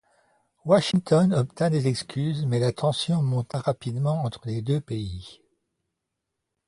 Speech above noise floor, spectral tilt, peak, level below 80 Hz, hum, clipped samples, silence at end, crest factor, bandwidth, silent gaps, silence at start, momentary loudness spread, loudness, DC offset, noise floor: 58 dB; -6.5 dB/octave; -6 dBFS; -54 dBFS; none; under 0.1%; 1.35 s; 20 dB; 11.5 kHz; none; 0.65 s; 11 LU; -25 LUFS; under 0.1%; -82 dBFS